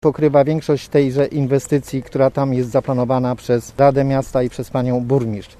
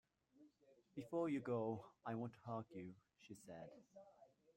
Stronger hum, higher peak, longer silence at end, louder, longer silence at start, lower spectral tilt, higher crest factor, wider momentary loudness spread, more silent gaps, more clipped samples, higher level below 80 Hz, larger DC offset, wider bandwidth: neither; first, 0 dBFS vs -32 dBFS; second, 0.15 s vs 0.3 s; first, -18 LUFS vs -48 LUFS; second, 0.05 s vs 0.4 s; about the same, -7.5 dB/octave vs -8 dB/octave; about the same, 16 dB vs 18 dB; second, 6 LU vs 22 LU; neither; neither; first, -44 dBFS vs -86 dBFS; neither; second, 14 kHz vs 15.5 kHz